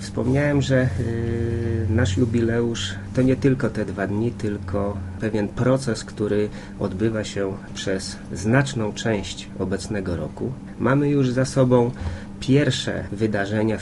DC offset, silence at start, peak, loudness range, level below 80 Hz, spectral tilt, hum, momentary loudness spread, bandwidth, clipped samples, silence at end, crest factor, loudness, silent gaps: under 0.1%; 0 s; -4 dBFS; 3 LU; -44 dBFS; -6.5 dB/octave; none; 9 LU; 11.5 kHz; under 0.1%; 0 s; 18 dB; -23 LUFS; none